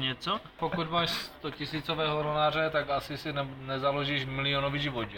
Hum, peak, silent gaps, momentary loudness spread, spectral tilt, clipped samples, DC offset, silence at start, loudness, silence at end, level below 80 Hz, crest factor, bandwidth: none; -16 dBFS; none; 7 LU; -5.5 dB/octave; under 0.1%; under 0.1%; 0 s; -31 LUFS; 0 s; -54 dBFS; 16 dB; 17 kHz